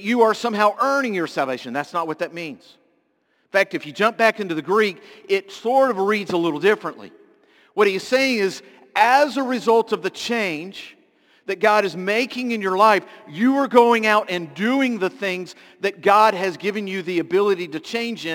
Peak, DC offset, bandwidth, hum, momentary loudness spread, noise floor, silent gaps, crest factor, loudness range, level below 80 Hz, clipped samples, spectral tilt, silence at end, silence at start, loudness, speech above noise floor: 0 dBFS; under 0.1%; 17 kHz; none; 11 LU; -66 dBFS; none; 20 dB; 4 LU; -72 dBFS; under 0.1%; -4.5 dB/octave; 0 s; 0 s; -20 LUFS; 46 dB